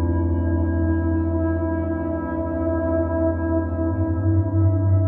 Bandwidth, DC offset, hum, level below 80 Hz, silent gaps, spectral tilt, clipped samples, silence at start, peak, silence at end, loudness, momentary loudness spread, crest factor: 2.4 kHz; under 0.1%; none; -32 dBFS; none; -13.5 dB/octave; under 0.1%; 0 s; -10 dBFS; 0 s; -22 LUFS; 5 LU; 12 dB